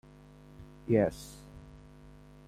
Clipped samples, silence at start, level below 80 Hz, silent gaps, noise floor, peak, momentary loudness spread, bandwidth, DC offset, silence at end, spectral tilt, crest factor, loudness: under 0.1%; 0.6 s; -56 dBFS; none; -54 dBFS; -14 dBFS; 26 LU; 15.5 kHz; under 0.1%; 0.7 s; -7.5 dB/octave; 22 dB; -30 LUFS